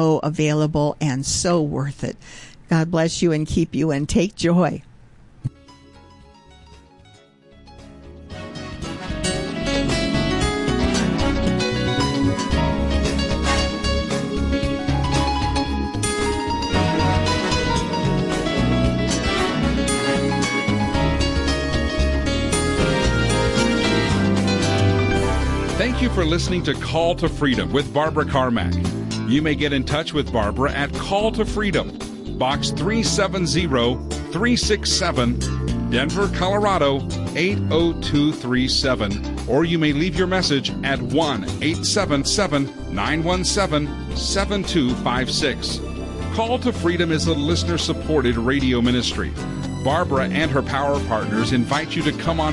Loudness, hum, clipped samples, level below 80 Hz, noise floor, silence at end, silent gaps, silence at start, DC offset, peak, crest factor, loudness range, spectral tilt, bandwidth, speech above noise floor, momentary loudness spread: -20 LUFS; none; under 0.1%; -32 dBFS; -50 dBFS; 0 s; none; 0 s; under 0.1%; -8 dBFS; 14 dB; 3 LU; -5 dB/octave; 11.5 kHz; 29 dB; 6 LU